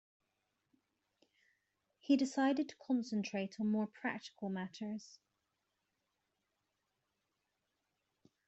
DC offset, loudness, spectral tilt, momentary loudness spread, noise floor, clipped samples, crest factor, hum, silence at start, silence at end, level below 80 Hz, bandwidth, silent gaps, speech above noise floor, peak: under 0.1%; -38 LUFS; -5.5 dB/octave; 11 LU; -86 dBFS; under 0.1%; 22 dB; none; 2.05 s; 3.4 s; -88 dBFS; 8.2 kHz; none; 49 dB; -20 dBFS